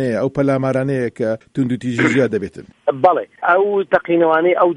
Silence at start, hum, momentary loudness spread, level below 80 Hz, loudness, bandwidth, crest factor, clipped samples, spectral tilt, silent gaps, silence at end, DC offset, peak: 0 s; none; 8 LU; -56 dBFS; -17 LUFS; 10.5 kHz; 16 dB; under 0.1%; -7 dB/octave; none; 0 s; under 0.1%; 0 dBFS